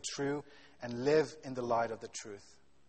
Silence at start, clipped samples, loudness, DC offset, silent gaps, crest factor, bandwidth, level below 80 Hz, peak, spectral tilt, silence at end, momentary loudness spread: 0.05 s; under 0.1%; -35 LUFS; under 0.1%; none; 18 dB; 8.4 kHz; -70 dBFS; -18 dBFS; -4.5 dB/octave; 0.5 s; 16 LU